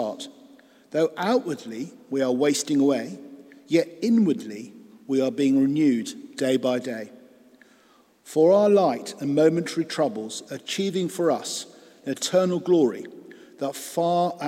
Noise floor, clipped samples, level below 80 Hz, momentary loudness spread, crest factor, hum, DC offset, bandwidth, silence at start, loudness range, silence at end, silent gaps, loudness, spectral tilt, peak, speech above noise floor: -58 dBFS; under 0.1%; -78 dBFS; 15 LU; 18 dB; none; under 0.1%; 16 kHz; 0 s; 3 LU; 0 s; none; -24 LUFS; -5 dB/octave; -6 dBFS; 35 dB